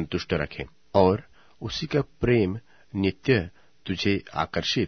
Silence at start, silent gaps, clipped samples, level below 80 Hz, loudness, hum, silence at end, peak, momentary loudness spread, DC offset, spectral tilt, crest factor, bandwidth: 0 s; none; under 0.1%; -48 dBFS; -26 LUFS; none; 0 s; -4 dBFS; 16 LU; 0.2%; -6 dB/octave; 22 dB; 6.6 kHz